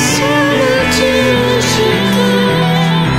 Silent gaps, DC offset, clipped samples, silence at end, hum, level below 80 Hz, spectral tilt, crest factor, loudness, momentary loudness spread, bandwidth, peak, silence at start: none; under 0.1%; under 0.1%; 0 s; none; -34 dBFS; -4.5 dB/octave; 10 dB; -11 LUFS; 1 LU; 16.5 kHz; 0 dBFS; 0 s